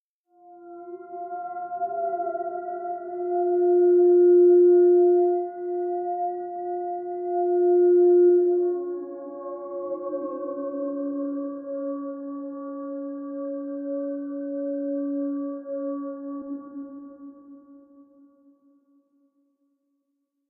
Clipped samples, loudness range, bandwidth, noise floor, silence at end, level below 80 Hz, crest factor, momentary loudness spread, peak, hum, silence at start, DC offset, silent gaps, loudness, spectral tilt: under 0.1%; 13 LU; 1.7 kHz; -77 dBFS; 2.75 s; -86 dBFS; 14 dB; 19 LU; -12 dBFS; none; 0.45 s; under 0.1%; none; -24 LUFS; -2 dB/octave